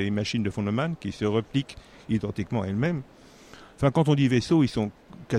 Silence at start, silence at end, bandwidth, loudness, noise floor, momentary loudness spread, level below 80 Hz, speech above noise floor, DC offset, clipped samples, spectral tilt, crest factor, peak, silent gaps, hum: 0 s; 0 s; 11 kHz; -26 LUFS; -49 dBFS; 9 LU; -52 dBFS; 24 dB; under 0.1%; under 0.1%; -7 dB/octave; 18 dB; -8 dBFS; none; none